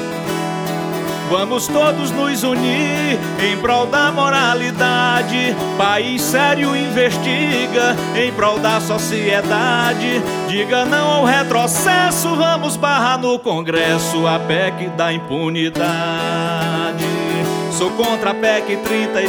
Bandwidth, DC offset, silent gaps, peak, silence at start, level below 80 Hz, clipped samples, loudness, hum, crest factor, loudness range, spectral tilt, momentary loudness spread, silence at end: over 20 kHz; under 0.1%; none; 0 dBFS; 0 s; -52 dBFS; under 0.1%; -16 LUFS; none; 16 dB; 3 LU; -4 dB/octave; 5 LU; 0 s